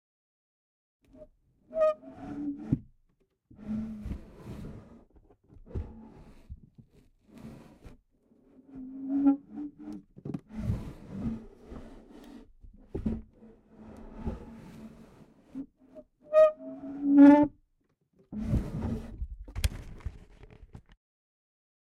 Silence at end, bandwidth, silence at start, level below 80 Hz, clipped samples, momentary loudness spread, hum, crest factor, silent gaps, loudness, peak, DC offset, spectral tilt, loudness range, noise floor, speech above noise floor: 1.15 s; 12.5 kHz; 1.2 s; -46 dBFS; under 0.1%; 27 LU; none; 24 dB; none; -28 LUFS; -8 dBFS; under 0.1%; -8 dB/octave; 23 LU; -74 dBFS; 43 dB